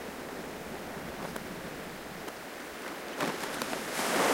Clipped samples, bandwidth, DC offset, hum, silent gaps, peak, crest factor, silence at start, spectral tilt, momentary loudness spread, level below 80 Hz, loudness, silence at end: under 0.1%; 16.5 kHz; under 0.1%; none; none; -16 dBFS; 20 dB; 0 s; -3 dB/octave; 9 LU; -60 dBFS; -37 LUFS; 0 s